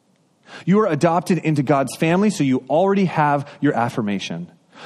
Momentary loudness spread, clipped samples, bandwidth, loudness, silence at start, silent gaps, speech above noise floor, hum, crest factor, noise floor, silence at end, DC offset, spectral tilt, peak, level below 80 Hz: 8 LU; under 0.1%; 13 kHz; -19 LUFS; 0.5 s; none; 37 dB; none; 16 dB; -55 dBFS; 0 s; under 0.1%; -6.5 dB/octave; -4 dBFS; -62 dBFS